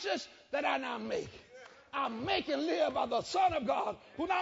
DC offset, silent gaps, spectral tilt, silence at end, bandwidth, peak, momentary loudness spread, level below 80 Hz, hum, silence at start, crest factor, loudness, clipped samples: under 0.1%; none; -2 dB/octave; 0 s; 7.6 kHz; -18 dBFS; 11 LU; -64 dBFS; none; 0 s; 16 dB; -34 LUFS; under 0.1%